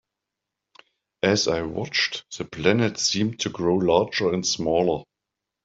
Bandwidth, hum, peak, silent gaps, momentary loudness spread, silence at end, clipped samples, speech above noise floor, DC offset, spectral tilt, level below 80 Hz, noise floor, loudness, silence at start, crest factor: 8 kHz; none; -4 dBFS; none; 5 LU; 0.6 s; under 0.1%; 62 dB; under 0.1%; -4 dB/octave; -56 dBFS; -85 dBFS; -23 LUFS; 1.25 s; 20 dB